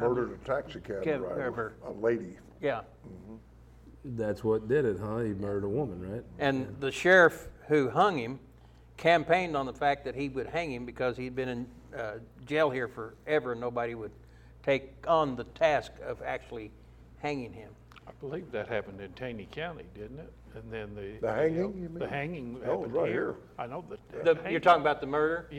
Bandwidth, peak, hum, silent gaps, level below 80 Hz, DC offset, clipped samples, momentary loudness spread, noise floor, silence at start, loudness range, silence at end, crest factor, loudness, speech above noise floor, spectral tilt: 15 kHz; -10 dBFS; none; none; -56 dBFS; under 0.1%; under 0.1%; 18 LU; -55 dBFS; 0 s; 11 LU; 0 s; 20 dB; -31 LUFS; 24 dB; -6 dB/octave